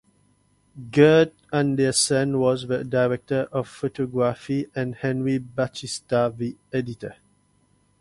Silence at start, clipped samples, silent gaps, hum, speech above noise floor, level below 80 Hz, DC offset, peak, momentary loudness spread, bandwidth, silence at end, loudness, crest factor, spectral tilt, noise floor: 0.75 s; under 0.1%; none; 50 Hz at -55 dBFS; 41 dB; -58 dBFS; under 0.1%; -2 dBFS; 11 LU; 11.5 kHz; 0.9 s; -23 LUFS; 20 dB; -5 dB/octave; -63 dBFS